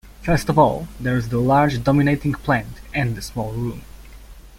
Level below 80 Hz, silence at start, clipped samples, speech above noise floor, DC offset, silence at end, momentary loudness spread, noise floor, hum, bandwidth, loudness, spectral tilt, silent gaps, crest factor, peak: -38 dBFS; 0.05 s; under 0.1%; 21 dB; under 0.1%; 0 s; 11 LU; -41 dBFS; none; 16.5 kHz; -20 LUFS; -7 dB/octave; none; 18 dB; -2 dBFS